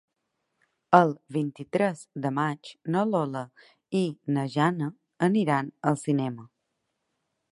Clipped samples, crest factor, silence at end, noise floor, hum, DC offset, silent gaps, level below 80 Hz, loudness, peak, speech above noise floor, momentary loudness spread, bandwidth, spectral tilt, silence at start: under 0.1%; 26 dB; 1.05 s; -80 dBFS; none; under 0.1%; none; -76 dBFS; -27 LUFS; -2 dBFS; 53 dB; 12 LU; 11.5 kHz; -7 dB/octave; 0.9 s